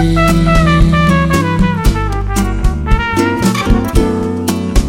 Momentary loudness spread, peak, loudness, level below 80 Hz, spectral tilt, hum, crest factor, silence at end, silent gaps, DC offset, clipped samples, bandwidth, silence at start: 6 LU; 0 dBFS; -13 LUFS; -16 dBFS; -6 dB/octave; none; 12 dB; 0 s; none; under 0.1%; under 0.1%; 16.5 kHz; 0 s